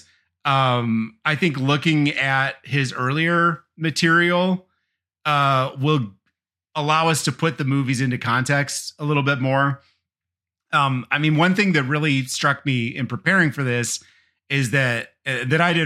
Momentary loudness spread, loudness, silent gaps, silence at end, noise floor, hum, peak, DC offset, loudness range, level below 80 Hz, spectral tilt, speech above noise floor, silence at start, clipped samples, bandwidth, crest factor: 8 LU; -20 LUFS; none; 0 s; -88 dBFS; none; -2 dBFS; under 0.1%; 2 LU; -66 dBFS; -5 dB/octave; 68 dB; 0.45 s; under 0.1%; 14.5 kHz; 18 dB